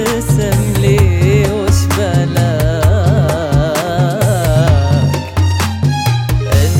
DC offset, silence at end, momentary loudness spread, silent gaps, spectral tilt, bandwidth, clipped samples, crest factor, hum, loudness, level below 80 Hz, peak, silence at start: under 0.1%; 0 s; 4 LU; none; -6 dB/octave; 17 kHz; under 0.1%; 10 dB; none; -13 LUFS; -24 dBFS; 0 dBFS; 0 s